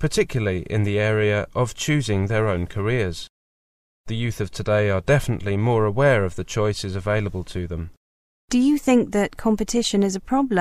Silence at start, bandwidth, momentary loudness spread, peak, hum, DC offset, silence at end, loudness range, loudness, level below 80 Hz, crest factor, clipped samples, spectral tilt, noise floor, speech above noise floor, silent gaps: 0 s; 14.5 kHz; 10 LU; -6 dBFS; none; under 0.1%; 0 s; 3 LU; -22 LUFS; -42 dBFS; 16 dB; under 0.1%; -6 dB/octave; under -90 dBFS; over 69 dB; 3.30-4.04 s, 7.97-8.48 s